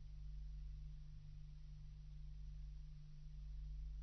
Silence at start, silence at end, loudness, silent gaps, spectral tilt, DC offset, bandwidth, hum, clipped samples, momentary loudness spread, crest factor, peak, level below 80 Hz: 0 s; 0 s; -57 LUFS; none; -8 dB/octave; under 0.1%; 6.2 kHz; 50 Hz at -55 dBFS; under 0.1%; 5 LU; 10 dB; -42 dBFS; -52 dBFS